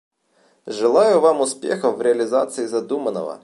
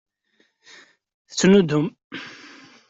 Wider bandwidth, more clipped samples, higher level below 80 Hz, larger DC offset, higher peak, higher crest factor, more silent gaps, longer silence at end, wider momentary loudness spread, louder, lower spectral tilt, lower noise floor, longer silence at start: first, 11.5 kHz vs 8 kHz; neither; second, -76 dBFS vs -60 dBFS; neither; about the same, -4 dBFS vs -4 dBFS; about the same, 16 dB vs 18 dB; second, none vs 2.04-2.10 s; second, 0.05 s vs 0.6 s; second, 10 LU vs 23 LU; about the same, -19 LUFS vs -19 LUFS; second, -4 dB/octave vs -5.5 dB/octave; second, -60 dBFS vs -66 dBFS; second, 0.65 s vs 1.3 s